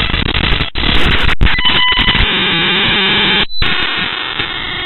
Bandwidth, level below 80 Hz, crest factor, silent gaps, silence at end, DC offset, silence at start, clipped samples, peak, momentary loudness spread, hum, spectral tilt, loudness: 8.2 kHz; -20 dBFS; 12 dB; none; 0 s; under 0.1%; 0 s; under 0.1%; 0 dBFS; 6 LU; none; -5.5 dB/octave; -11 LUFS